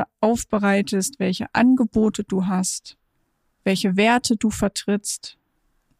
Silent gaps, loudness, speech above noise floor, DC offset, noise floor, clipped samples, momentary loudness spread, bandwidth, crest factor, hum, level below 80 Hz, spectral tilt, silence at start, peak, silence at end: none; -21 LUFS; 48 dB; under 0.1%; -69 dBFS; under 0.1%; 9 LU; 15.5 kHz; 16 dB; none; -50 dBFS; -4.5 dB/octave; 0 s; -6 dBFS; 0.7 s